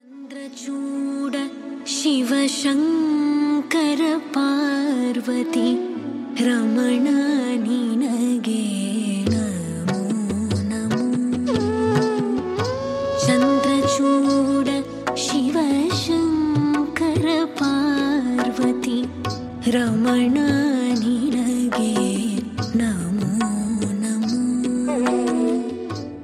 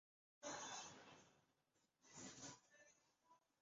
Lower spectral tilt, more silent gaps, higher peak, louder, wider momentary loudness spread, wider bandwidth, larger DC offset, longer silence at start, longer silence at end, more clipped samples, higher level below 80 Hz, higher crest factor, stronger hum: first, -5 dB/octave vs -1.5 dB/octave; neither; first, -4 dBFS vs -40 dBFS; first, -21 LUFS vs -56 LUFS; second, 7 LU vs 14 LU; first, 14 kHz vs 7.6 kHz; neither; second, 0.1 s vs 0.4 s; second, 0 s vs 0.25 s; neither; first, -52 dBFS vs under -90 dBFS; second, 16 dB vs 22 dB; neither